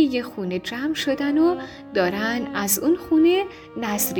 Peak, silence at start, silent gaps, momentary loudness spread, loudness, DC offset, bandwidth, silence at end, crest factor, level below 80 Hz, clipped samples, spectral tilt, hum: -8 dBFS; 0 s; none; 10 LU; -22 LUFS; under 0.1%; over 20 kHz; 0 s; 14 dB; -56 dBFS; under 0.1%; -3.5 dB/octave; none